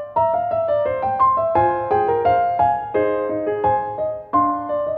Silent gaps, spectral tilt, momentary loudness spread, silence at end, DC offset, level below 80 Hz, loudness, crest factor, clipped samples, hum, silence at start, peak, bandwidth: none; -9.5 dB/octave; 5 LU; 0 s; under 0.1%; -48 dBFS; -19 LUFS; 14 dB; under 0.1%; none; 0 s; -4 dBFS; 4.6 kHz